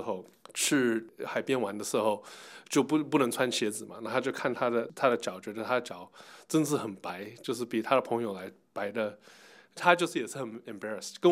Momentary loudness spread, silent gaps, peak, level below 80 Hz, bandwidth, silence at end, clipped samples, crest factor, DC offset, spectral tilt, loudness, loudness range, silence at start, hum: 13 LU; none; -6 dBFS; -88 dBFS; 16 kHz; 0 s; under 0.1%; 26 dB; under 0.1%; -4 dB/octave; -31 LUFS; 3 LU; 0 s; none